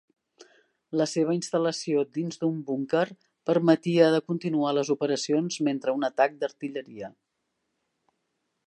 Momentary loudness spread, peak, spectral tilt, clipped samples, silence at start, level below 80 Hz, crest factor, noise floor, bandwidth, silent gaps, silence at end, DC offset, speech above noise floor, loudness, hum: 12 LU; -6 dBFS; -5.5 dB/octave; under 0.1%; 0.4 s; -80 dBFS; 20 dB; -79 dBFS; 11 kHz; none; 1.55 s; under 0.1%; 53 dB; -26 LUFS; none